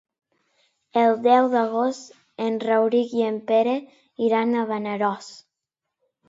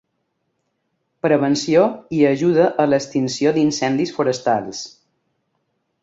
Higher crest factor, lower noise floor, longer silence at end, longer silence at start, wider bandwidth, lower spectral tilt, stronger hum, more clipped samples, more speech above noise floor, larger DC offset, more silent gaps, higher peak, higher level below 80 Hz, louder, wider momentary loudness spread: about the same, 18 dB vs 18 dB; first, -84 dBFS vs -72 dBFS; second, 0.95 s vs 1.15 s; second, 0.95 s vs 1.25 s; about the same, 7.8 kHz vs 7.8 kHz; about the same, -5.5 dB/octave vs -5.5 dB/octave; neither; neither; first, 63 dB vs 55 dB; neither; neither; about the same, -4 dBFS vs -2 dBFS; second, -78 dBFS vs -60 dBFS; second, -22 LUFS vs -18 LUFS; first, 11 LU vs 7 LU